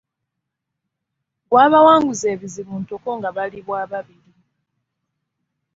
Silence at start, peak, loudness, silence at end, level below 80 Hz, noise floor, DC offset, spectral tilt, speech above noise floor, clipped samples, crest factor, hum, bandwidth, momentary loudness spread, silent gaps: 1.5 s; -2 dBFS; -16 LUFS; 1.75 s; -62 dBFS; -80 dBFS; under 0.1%; -4.5 dB/octave; 63 dB; under 0.1%; 18 dB; none; 7.8 kHz; 18 LU; none